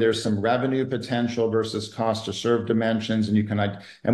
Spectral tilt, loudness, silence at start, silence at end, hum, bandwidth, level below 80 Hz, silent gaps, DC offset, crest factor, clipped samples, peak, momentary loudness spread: -6 dB/octave; -24 LUFS; 0 s; 0 s; none; 12 kHz; -64 dBFS; none; under 0.1%; 14 dB; under 0.1%; -8 dBFS; 4 LU